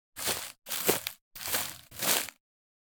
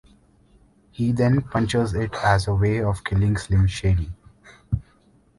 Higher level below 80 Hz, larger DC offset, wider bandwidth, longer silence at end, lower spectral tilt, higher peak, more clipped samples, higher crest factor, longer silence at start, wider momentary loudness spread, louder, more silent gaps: second, -66 dBFS vs -34 dBFS; neither; first, over 20 kHz vs 11.5 kHz; about the same, 0.6 s vs 0.6 s; second, -1 dB/octave vs -7 dB/octave; about the same, -6 dBFS vs -4 dBFS; neither; first, 28 dB vs 18 dB; second, 0.15 s vs 1 s; about the same, 11 LU vs 10 LU; second, -31 LUFS vs -22 LUFS; first, 1.21-1.31 s vs none